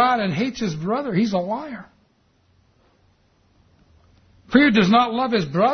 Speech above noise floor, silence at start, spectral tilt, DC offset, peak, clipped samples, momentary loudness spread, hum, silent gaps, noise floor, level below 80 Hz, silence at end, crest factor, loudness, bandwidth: 42 dB; 0 s; -6 dB/octave; under 0.1%; 0 dBFS; under 0.1%; 13 LU; none; none; -61 dBFS; -56 dBFS; 0 s; 22 dB; -20 LUFS; 6.6 kHz